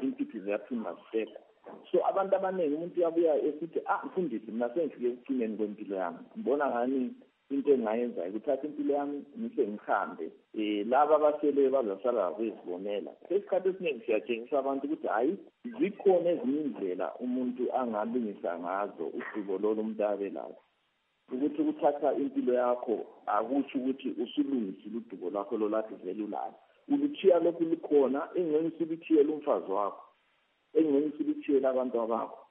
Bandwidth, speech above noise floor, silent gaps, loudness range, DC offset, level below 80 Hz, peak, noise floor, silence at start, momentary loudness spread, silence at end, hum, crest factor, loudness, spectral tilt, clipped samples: 3.9 kHz; 45 dB; none; 4 LU; under 0.1%; under -90 dBFS; -12 dBFS; -75 dBFS; 0 s; 10 LU; 0.05 s; none; 18 dB; -31 LUFS; -5 dB/octave; under 0.1%